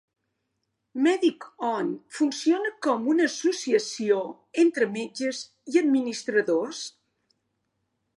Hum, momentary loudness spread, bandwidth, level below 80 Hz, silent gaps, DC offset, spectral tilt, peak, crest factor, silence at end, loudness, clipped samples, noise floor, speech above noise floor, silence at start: none; 10 LU; 11.5 kHz; -84 dBFS; none; under 0.1%; -3.5 dB/octave; -10 dBFS; 18 dB; 1.3 s; -25 LUFS; under 0.1%; -79 dBFS; 54 dB; 0.95 s